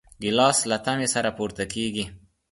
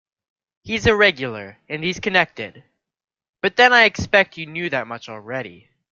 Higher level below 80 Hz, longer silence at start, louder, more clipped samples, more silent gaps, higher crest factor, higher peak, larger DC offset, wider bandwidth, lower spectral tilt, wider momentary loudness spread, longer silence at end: about the same, -54 dBFS vs -50 dBFS; second, 0.2 s vs 0.65 s; second, -24 LUFS vs -18 LUFS; neither; second, none vs 3.29-3.33 s; about the same, 20 dB vs 20 dB; second, -4 dBFS vs 0 dBFS; neither; first, 12 kHz vs 7.6 kHz; about the same, -3 dB/octave vs -4 dB/octave; second, 10 LU vs 19 LU; about the same, 0.35 s vs 0.4 s